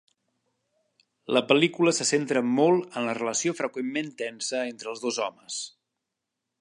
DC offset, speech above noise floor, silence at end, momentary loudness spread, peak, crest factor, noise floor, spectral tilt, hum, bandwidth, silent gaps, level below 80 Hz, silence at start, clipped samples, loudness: under 0.1%; 58 dB; 0.9 s; 12 LU; -4 dBFS; 24 dB; -84 dBFS; -3.5 dB/octave; none; 11.5 kHz; none; -80 dBFS; 1.3 s; under 0.1%; -26 LUFS